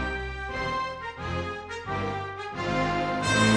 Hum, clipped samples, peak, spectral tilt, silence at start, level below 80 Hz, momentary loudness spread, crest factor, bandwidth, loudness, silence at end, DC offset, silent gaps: none; under 0.1%; -8 dBFS; -4.5 dB/octave; 0 s; -44 dBFS; 8 LU; 20 dB; 10 kHz; -29 LUFS; 0 s; under 0.1%; none